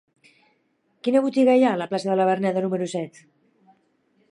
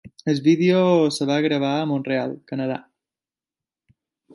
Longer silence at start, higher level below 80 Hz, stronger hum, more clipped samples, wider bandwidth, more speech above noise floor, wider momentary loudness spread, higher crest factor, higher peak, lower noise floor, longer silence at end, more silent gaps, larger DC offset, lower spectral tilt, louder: first, 1.05 s vs 0.05 s; second, -78 dBFS vs -68 dBFS; neither; neither; about the same, 11 kHz vs 11.5 kHz; second, 47 dB vs over 70 dB; about the same, 12 LU vs 11 LU; about the same, 16 dB vs 16 dB; about the same, -8 dBFS vs -6 dBFS; second, -68 dBFS vs under -90 dBFS; second, 1.2 s vs 1.55 s; neither; neither; about the same, -6.5 dB/octave vs -6.5 dB/octave; about the same, -22 LUFS vs -21 LUFS